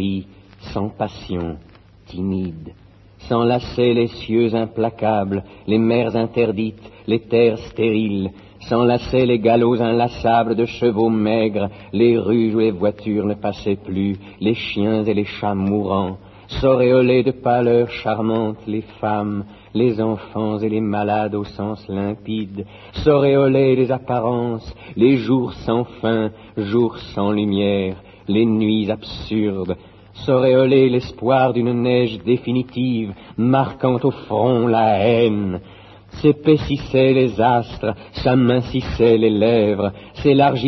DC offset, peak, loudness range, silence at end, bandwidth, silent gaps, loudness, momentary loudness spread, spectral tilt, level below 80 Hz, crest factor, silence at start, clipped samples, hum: under 0.1%; -2 dBFS; 4 LU; 0 s; 6.2 kHz; none; -18 LUFS; 11 LU; -8.5 dB/octave; -44 dBFS; 16 dB; 0 s; under 0.1%; none